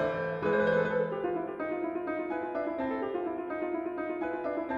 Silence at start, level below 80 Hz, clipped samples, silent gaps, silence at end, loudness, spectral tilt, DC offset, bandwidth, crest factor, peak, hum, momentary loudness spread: 0 s; -64 dBFS; under 0.1%; none; 0 s; -32 LUFS; -8 dB/octave; under 0.1%; 7 kHz; 16 dB; -16 dBFS; none; 7 LU